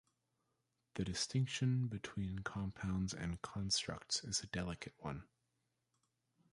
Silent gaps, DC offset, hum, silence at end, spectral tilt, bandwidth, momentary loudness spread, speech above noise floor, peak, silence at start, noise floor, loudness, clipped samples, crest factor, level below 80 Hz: none; under 0.1%; none; 1.3 s; -4 dB/octave; 11.5 kHz; 10 LU; 44 dB; -24 dBFS; 0.95 s; -85 dBFS; -41 LUFS; under 0.1%; 18 dB; -60 dBFS